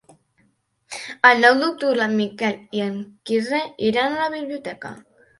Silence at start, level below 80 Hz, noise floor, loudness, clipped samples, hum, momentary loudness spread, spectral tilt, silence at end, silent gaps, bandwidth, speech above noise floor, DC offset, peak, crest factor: 0.9 s; -66 dBFS; -64 dBFS; -20 LUFS; under 0.1%; none; 18 LU; -4.5 dB/octave; 0.4 s; none; 11.5 kHz; 44 dB; under 0.1%; 0 dBFS; 22 dB